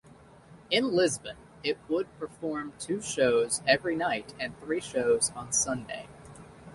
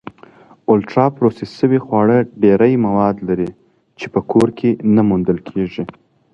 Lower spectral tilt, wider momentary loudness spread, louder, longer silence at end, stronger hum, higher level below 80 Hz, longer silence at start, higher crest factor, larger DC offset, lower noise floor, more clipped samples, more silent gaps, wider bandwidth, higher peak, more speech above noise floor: second, -2.5 dB/octave vs -9 dB/octave; first, 15 LU vs 10 LU; second, -29 LUFS vs -16 LUFS; second, 0 s vs 0.45 s; neither; second, -62 dBFS vs -48 dBFS; second, 0.5 s vs 0.7 s; first, 22 dB vs 16 dB; neither; first, -54 dBFS vs -44 dBFS; neither; neither; first, 11.5 kHz vs 9.6 kHz; second, -8 dBFS vs 0 dBFS; second, 25 dB vs 30 dB